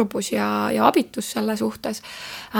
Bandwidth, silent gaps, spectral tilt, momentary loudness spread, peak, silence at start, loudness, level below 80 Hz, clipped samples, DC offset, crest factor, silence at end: over 20 kHz; none; -4.5 dB/octave; 14 LU; 0 dBFS; 0 s; -22 LUFS; -60 dBFS; under 0.1%; under 0.1%; 22 dB; 0 s